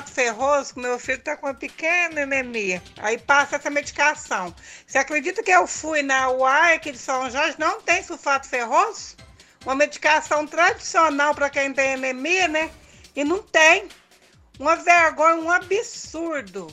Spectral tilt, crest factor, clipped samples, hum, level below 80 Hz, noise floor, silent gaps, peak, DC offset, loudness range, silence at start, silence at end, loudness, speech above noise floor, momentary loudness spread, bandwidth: -2 dB/octave; 20 dB; under 0.1%; none; -56 dBFS; -54 dBFS; none; -2 dBFS; under 0.1%; 3 LU; 0 s; 0 s; -20 LUFS; 33 dB; 12 LU; 13.5 kHz